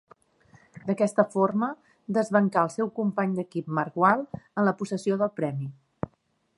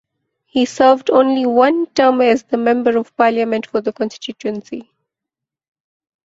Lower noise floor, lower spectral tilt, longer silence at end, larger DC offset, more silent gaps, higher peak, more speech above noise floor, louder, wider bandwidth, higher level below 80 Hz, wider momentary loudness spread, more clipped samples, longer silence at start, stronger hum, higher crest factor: second, -69 dBFS vs -84 dBFS; first, -7.5 dB/octave vs -4.5 dB/octave; second, 0.5 s vs 1.45 s; neither; neither; second, -6 dBFS vs -2 dBFS; second, 43 dB vs 69 dB; second, -26 LUFS vs -15 LUFS; first, 11.5 kHz vs 7.8 kHz; second, -66 dBFS vs -60 dBFS; first, 15 LU vs 12 LU; neither; first, 0.75 s vs 0.55 s; neither; first, 22 dB vs 16 dB